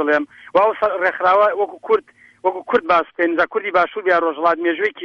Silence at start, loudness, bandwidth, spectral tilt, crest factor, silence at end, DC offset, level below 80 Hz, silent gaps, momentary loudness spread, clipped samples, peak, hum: 0 s; -18 LUFS; 7 kHz; -5.5 dB/octave; 14 dB; 0 s; under 0.1%; -60 dBFS; none; 5 LU; under 0.1%; -4 dBFS; none